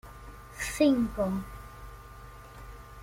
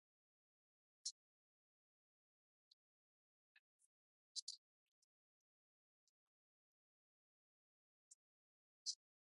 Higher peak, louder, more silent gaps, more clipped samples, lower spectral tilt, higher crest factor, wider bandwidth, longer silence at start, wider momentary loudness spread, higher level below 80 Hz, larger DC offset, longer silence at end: first, -12 dBFS vs -32 dBFS; first, -28 LUFS vs -52 LUFS; second, none vs 1.11-3.79 s, 3.86-4.35 s, 4.42-4.47 s, 4.58-8.85 s; neither; first, -5.5 dB/octave vs 6.5 dB/octave; second, 20 dB vs 30 dB; first, 16.5 kHz vs 9.6 kHz; second, 0.05 s vs 1.05 s; first, 23 LU vs 6 LU; first, -48 dBFS vs under -90 dBFS; neither; second, 0 s vs 0.3 s